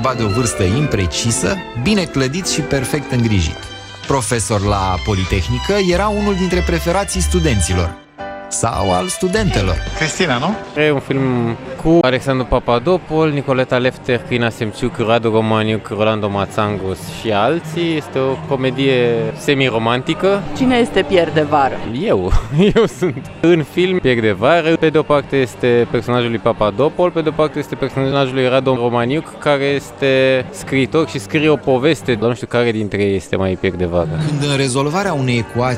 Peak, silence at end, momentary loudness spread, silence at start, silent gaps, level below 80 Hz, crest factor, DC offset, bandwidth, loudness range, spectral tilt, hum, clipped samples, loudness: 0 dBFS; 0 s; 5 LU; 0 s; none; -30 dBFS; 16 dB; under 0.1%; 16 kHz; 3 LU; -5 dB/octave; none; under 0.1%; -16 LUFS